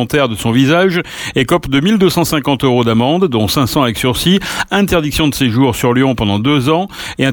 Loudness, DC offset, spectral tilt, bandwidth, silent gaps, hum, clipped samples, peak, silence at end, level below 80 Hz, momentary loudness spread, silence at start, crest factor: -13 LUFS; under 0.1%; -5.5 dB/octave; 19 kHz; none; none; under 0.1%; 0 dBFS; 0 s; -36 dBFS; 4 LU; 0 s; 12 dB